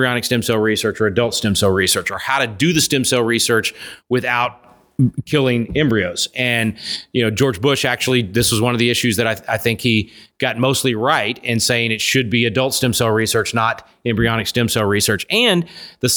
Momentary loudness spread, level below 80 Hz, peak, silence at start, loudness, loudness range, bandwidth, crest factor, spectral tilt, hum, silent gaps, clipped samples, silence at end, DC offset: 5 LU; -46 dBFS; -2 dBFS; 0 s; -17 LUFS; 2 LU; over 20 kHz; 16 dB; -4 dB/octave; none; none; under 0.1%; 0 s; under 0.1%